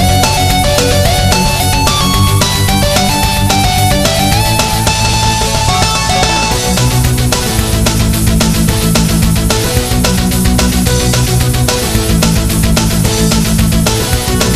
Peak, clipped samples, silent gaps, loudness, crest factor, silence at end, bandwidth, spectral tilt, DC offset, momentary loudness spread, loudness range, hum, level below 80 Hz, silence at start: 0 dBFS; under 0.1%; none; -10 LUFS; 10 dB; 0 s; 15.5 kHz; -4 dB/octave; under 0.1%; 2 LU; 1 LU; none; -18 dBFS; 0 s